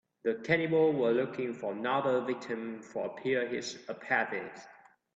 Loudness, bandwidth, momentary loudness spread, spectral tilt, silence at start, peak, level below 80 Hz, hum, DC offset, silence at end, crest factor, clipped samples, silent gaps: -32 LUFS; 7.8 kHz; 12 LU; -5.5 dB/octave; 0.25 s; -12 dBFS; -74 dBFS; none; under 0.1%; 0.4 s; 20 dB; under 0.1%; none